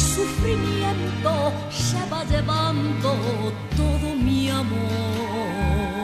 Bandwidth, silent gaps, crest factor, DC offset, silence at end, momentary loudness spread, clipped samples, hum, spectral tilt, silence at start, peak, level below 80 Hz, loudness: 15 kHz; none; 14 dB; under 0.1%; 0 s; 4 LU; under 0.1%; none; -5.5 dB/octave; 0 s; -10 dBFS; -32 dBFS; -23 LUFS